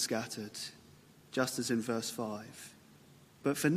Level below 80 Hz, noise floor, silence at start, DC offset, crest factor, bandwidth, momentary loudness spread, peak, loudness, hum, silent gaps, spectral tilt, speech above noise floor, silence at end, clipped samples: -78 dBFS; -60 dBFS; 0 s; under 0.1%; 20 dB; 15 kHz; 17 LU; -16 dBFS; -37 LUFS; none; none; -4 dB/octave; 25 dB; 0 s; under 0.1%